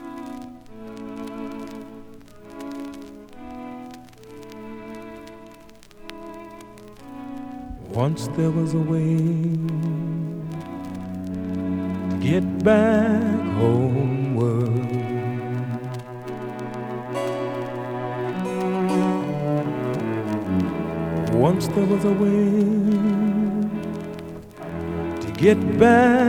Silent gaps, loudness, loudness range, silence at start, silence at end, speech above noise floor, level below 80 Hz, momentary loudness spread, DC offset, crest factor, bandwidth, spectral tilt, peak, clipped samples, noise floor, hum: none; -23 LUFS; 18 LU; 0 s; 0 s; 27 dB; -54 dBFS; 20 LU; under 0.1%; 22 dB; 15 kHz; -8 dB/octave; -2 dBFS; under 0.1%; -46 dBFS; none